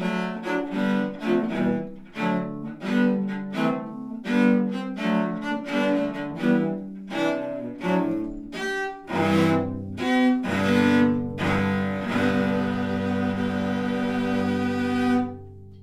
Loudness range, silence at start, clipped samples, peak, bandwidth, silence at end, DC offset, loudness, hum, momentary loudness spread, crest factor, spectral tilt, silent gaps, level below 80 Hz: 3 LU; 0 s; under 0.1%; -8 dBFS; 12.5 kHz; 0 s; under 0.1%; -25 LUFS; none; 9 LU; 16 dB; -7 dB/octave; none; -56 dBFS